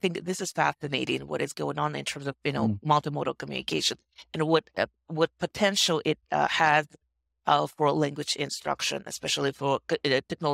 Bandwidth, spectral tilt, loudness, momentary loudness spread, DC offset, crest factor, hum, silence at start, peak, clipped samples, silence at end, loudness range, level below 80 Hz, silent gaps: 16 kHz; -4 dB/octave; -27 LUFS; 9 LU; under 0.1%; 20 dB; none; 0.05 s; -8 dBFS; under 0.1%; 0 s; 3 LU; -66 dBFS; none